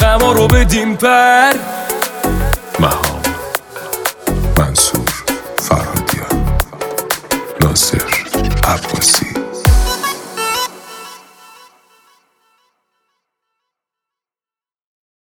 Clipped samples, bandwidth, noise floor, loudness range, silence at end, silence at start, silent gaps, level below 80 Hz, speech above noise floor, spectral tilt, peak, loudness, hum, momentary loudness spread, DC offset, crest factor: under 0.1%; over 20 kHz; under -90 dBFS; 7 LU; 4.1 s; 0 s; none; -22 dBFS; over 80 dB; -3.5 dB/octave; 0 dBFS; -14 LUFS; none; 10 LU; under 0.1%; 16 dB